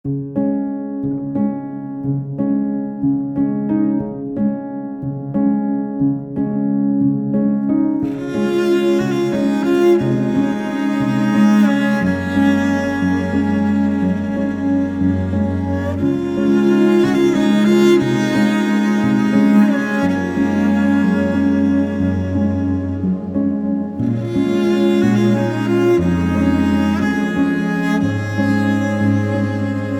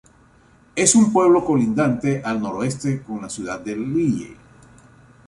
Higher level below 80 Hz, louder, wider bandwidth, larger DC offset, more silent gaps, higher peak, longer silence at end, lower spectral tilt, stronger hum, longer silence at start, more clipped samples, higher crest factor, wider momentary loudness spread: first, -46 dBFS vs -54 dBFS; first, -17 LUFS vs -20 LUFS; about the same, 12 kHz vs 11.5 kHz; neither; neither; about the same, -2 dBFS vs 0 dBFS; second, 0 s vs 0.95 s; first, -7.5 dB/octave vs -5 dB/octave; neither; second, 0.05 s vs 0.75 s; neither; second, 14 dB vs 20 dB; second, 7 LU vs 14 LU